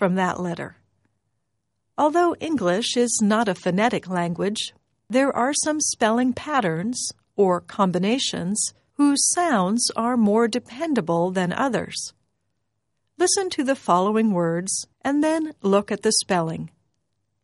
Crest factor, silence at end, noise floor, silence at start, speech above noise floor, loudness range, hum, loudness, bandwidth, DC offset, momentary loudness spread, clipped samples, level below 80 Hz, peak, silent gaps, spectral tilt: 18 dB; 0.75 s; -77 dBFS; 0 s; 56 dB; 3 LU; none; -22 LUFS; 11.5 kHz; under 0.1%; 8 LU; under 0.1%; -64 dBFS; -4 dBFS; none; -4 dB/octave